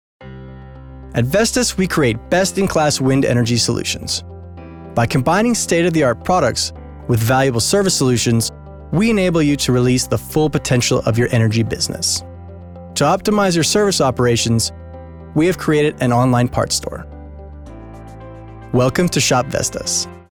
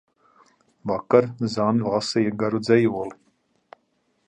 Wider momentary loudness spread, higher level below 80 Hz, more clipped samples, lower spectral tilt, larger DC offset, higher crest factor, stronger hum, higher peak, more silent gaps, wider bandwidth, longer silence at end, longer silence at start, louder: first, 21 LU vs 11 LU; first, -38 dBFS vs -62 dBFS; neither; second, -4.5 dB/octave vs -6.5 dB/octave; neither; second, 14 dB vs 20 dB; neither; about the same, -2 dBFS vs -4 dBFS; neither; first, over 20 kHz vs 9.8 kHz; second, 0.1 s vs 1.15 s; second, 0.2 s vs 0.85 s; first, -16 LUFS vs -22 LUFS